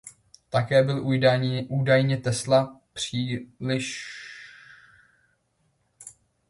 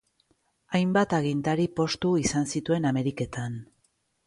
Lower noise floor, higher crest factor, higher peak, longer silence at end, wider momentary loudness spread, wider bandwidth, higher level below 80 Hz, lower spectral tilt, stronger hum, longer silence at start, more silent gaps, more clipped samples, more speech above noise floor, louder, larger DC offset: about the same, -70 dBFS vs -71 dBFS; about the same, 20 dB vs 16 dB; first, -6 dBFS vs -12 dBFS; second, 0.4 s vs 0.65 s; first, 24 LU vs 9 LU; about the same, 11.5 kHz vs 11.5 kHz; about the same, -60 dBFS vs -56 dBFS; about the same, -5.5 dB/octave vs -5.5 dB/octave; neither; second, 0.05 s vs 0.7 s; neither; neither; about the same, 47 dB vs 45 dB; first, -24 LUFS vs -27 LUFS; neither